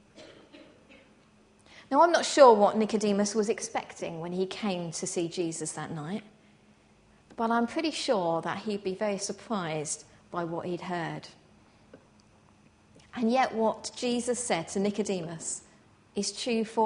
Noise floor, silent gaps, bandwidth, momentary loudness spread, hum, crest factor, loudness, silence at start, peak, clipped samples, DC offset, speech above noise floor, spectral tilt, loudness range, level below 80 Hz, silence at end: -61 dBFS; none; 10.5 kHz; 14 LU; none; 24 dB; -29 LUFS; 0.15 s; -6 dBFS; under 0.1%; under 0.1%; 33 dB; -4 dB/octave; 10 LU; -70 dBFS; 0 s